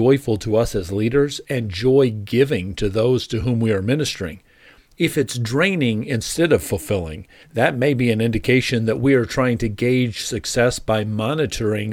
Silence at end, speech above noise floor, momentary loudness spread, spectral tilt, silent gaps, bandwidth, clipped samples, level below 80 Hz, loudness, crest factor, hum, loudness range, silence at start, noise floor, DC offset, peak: 0 s; 31 dB; 6 LU; -5.5 dB/octave; none; 17.5 kHz; under 0.1%; -40 dBFS; -20 LUFS; 16 dB; none; 2 LU; 0 s; -50 dBFS; under 0.1%; -2 dBFS